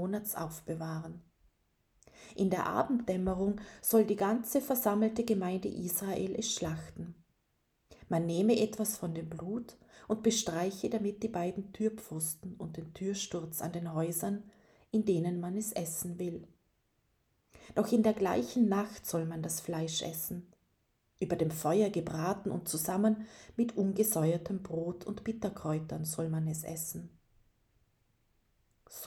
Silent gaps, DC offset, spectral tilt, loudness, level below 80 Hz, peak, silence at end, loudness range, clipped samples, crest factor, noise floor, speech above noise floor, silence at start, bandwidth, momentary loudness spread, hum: none; under 0.1%; -5 dB/octave; -34 LUFS; -64 dBFS; -14 dBFS; 0 s; 5 LU; under 0.1%; 20 dB; -77 dBFS; 44 dB; 0 s; over 20 kHz; 11 LU; none